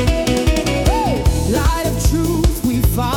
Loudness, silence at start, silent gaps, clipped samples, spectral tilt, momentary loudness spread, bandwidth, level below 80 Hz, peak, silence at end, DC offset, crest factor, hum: -17 LUFS; 0 s; none; under 0.1%; -5.5 dB/octave; 1 LU; 18 kHz; -20 dBFS; -4 dBFS; 0 s; under 0.1%; 12 dB; none